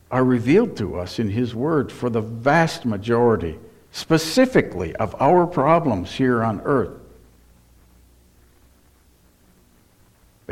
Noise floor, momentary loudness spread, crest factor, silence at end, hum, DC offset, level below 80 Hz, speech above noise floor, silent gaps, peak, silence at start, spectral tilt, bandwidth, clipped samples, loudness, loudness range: -56 dBFS; 10 LU; 20 dB; 0 s; none; under 0.1%; -48 dBFS; 36 dB; none; -2 dBFS; 0.1 s; -6.5 dB/octave; 15.5 kHz; under 0.1%; -20 LUFS; 7 LU